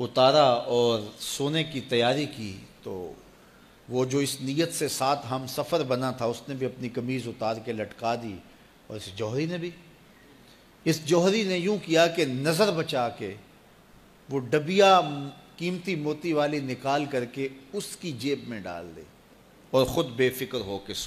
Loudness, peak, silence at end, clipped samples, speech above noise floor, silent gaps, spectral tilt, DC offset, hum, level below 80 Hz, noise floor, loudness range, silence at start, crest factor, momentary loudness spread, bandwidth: -27 LUFS; -8 dBFS; 0 s; under 0.1%; 28 dB; none; -4.5 dB/octave; under 0.1%; none; -62 dBFS; -55 dBFS; 7 LU; 0 s; 20 dB; 16 LU; 15 kHz